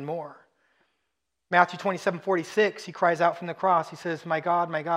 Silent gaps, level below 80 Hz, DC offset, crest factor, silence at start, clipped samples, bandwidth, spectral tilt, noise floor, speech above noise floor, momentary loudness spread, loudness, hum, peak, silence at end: none; -82 dBFS; under 0.1%; 22 dB; 0 s; under 0.1%; 13.5 kHz; -5.5 dB/octave; -81 dBFS; 56 dB; 11 LU; -26 LUFS; none; -4 dBFS; 0 s